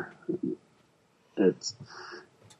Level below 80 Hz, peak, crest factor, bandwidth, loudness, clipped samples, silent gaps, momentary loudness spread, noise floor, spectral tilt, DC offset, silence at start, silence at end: -78 dBFS; -10 dBFS; 24 dB; 10.5 kHz; -32 LUFS; under 0.1%; none; 18 LU; -66 dBFS; -5 dB/octave; under 0.1%; 0 s; 0.35 s